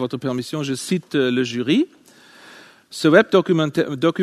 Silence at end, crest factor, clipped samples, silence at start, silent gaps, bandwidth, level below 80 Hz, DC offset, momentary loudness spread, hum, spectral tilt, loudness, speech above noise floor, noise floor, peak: 0 s; 18 dB; under 0.1%; 0 s; none; 13.5 kHz; -66 dBFS; under 0.1%; 10 LU; none; -5.5 dB/octave; -19 LUFS; 28 dB; -47 dBFS; 0 dBFS